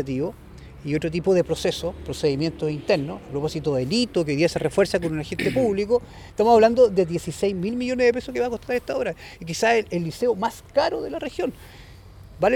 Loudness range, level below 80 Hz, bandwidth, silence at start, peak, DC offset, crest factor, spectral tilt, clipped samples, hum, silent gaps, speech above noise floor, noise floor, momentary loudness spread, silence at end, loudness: 4 LU; -46 dBFS; 16.5 kHz; 0 s; -4 dBFS; under 0.1%; 18 dB; -5.5 dB/octave; under 0.1%; none; none; 21 dB; -44 dBFS; 11 LU; 0 s; -23 LUFS